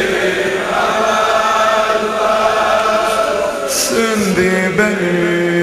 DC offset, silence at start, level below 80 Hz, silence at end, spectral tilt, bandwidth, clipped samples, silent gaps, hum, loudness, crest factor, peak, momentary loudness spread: under 0.1%; 0 s; -44 dBFS; 0 s; -3.5 dB/octave; 15 kHz; under 0.1%; none; none; -14 LUFS; 14 dB; 0 dBFS; 3 LU